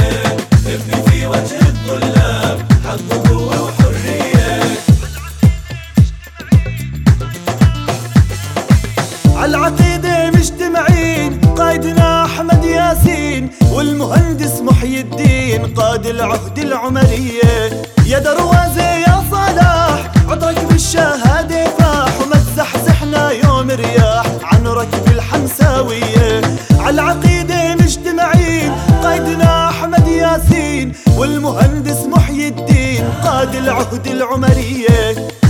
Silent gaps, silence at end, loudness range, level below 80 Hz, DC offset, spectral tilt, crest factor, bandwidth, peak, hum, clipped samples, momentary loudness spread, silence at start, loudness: none; 0 s; 2 LU; -22 dBFS; under 0.1%; -6 dB/octave; 12 dB; 17.5 kHz; 0 dBFS; none; under 0.1%; 5 LU; 0 s; -12 LUFS